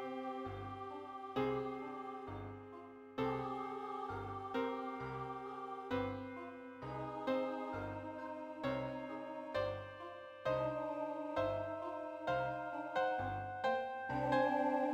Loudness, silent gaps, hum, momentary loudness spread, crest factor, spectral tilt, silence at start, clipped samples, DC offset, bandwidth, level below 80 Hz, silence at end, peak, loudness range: -41 LUFS; none; none; 10 LU; 20 dB; -7 dB/octave; 0 s; under 0.1%; under 0.1%; 9.8 kHz; -66 dBFS; 0 s; -22 dBFS; 4 LU